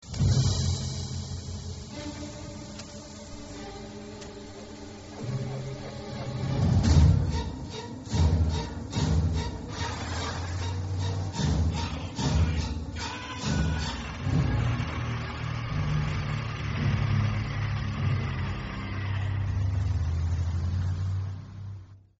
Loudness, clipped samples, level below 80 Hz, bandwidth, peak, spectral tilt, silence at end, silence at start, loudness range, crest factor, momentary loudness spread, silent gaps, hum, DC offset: -29 LUFS; under 0.1%; -36 dBFS; 8 kHz; -8 dBFS; -6 dB/octave; 0.2 s; 0 s; 12 LU; 20 dB; 15 LU; none; none; under 0.1%